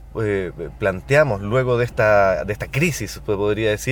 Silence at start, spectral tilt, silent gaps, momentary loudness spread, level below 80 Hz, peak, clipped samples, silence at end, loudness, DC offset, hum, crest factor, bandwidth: 0 s; -5.5 dB/octave; none; 8 LU; -38 dBFS; -2 dBFS; under 0.1%; 0 s; -20 LUFS; under 0.1%; none; 16 dB; 19.5 kHz